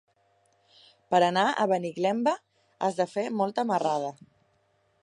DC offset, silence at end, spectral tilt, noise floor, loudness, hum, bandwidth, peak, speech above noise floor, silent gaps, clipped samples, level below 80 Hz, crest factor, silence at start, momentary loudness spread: under 0.1%; 0.9 s; -5 dB/octave; -69 dBFS; -27 LUFS; none; 11 kHz; -10 dBFS; 43 dB; none; under 0.1%; -80 dBFS; 20 dB; 1.1 s; 8 LU